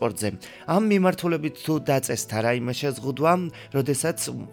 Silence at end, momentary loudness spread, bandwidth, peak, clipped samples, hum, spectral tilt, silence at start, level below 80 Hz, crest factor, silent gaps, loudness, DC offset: 0 s; 8 LU; 19.5 kHz; -6 dBFS; under 0.1%; none; -5 dB/octave; 0 s; -62 dBFS; 18 dB; none; -24 LUFS; under 0.1%